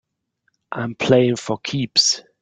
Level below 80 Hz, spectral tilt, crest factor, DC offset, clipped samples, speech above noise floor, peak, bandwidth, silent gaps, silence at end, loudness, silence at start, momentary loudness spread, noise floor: -60 dBFS; -3.5 dB/octave; 18 dB; under 0.1%; under 0.1%; 51 dB; -2 dBFS; 11 kHz; none; 0.2 s; -18 LUFS; 0.7 s; 12 LU; -70 dBFS